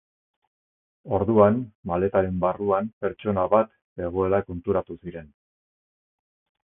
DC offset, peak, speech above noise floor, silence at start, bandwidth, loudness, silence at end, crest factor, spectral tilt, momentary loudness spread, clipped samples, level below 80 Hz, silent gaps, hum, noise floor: under 0.1%; -4 dBFS; over 67 dB; 1.05 s; 3.7 kHz; -24 LUFS; 1.4 s; 22 dB; -12.5 dB/octave; 14 LU; under 0.1%; -48 dBFS; 1.75-1.83 s, 2.93-3.01 s, 3.84-3.96 s; none; under -90 dBFS